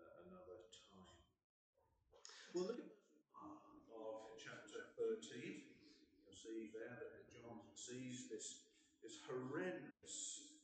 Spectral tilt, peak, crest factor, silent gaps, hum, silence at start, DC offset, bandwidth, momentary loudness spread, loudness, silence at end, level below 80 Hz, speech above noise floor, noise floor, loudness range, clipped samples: -3.5 dB/octave; -36 dBFS; 18 dB; 1.44-1.73 s; none; 0 s; under 0.1%; 9 kHz; 17 LU; -53 LUFS; 0 s; -88 dBFS; 26 dB; -75 dBFS; 4 LU; under 0.1%